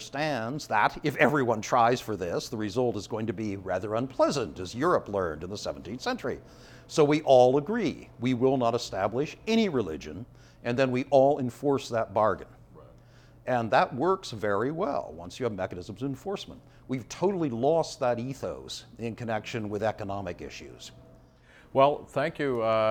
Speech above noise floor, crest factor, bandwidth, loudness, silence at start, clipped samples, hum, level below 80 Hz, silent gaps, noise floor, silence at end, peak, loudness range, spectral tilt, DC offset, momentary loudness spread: 28 dB; 22 dB; 18 kHz; -28 LUFS; 0 s; under 0.1%; none; -58 dBFS; none; -56 dBFS; 0 s; -6 dBFS; 6 LU; -5.5 dB/octave; under 0.1%; 13 LU